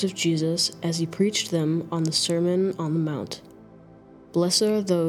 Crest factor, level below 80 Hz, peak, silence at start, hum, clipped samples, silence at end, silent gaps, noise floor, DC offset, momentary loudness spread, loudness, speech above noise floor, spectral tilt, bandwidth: 16 dB; -66 dBFS; -8 dBFS; 0 s; none; under 0.1%; 0 s; none; -49 dBFS; under 0.1%; 8 LU; -24 LUFS; 25 dB; -4.5 dB/octave; 15 kHz